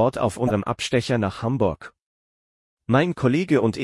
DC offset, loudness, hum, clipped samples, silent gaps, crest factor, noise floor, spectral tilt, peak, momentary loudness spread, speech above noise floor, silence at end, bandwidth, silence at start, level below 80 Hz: under 0.1%; -22 LUFS; none; under 0.1%; 2.02-2.77 s; 16 dB; under -90 dBFS; -6.5 dB/octave; -6 dBFS; 5 LU; over 69 dB; 0 s; 12 kHz; 0 s; -52 dBFS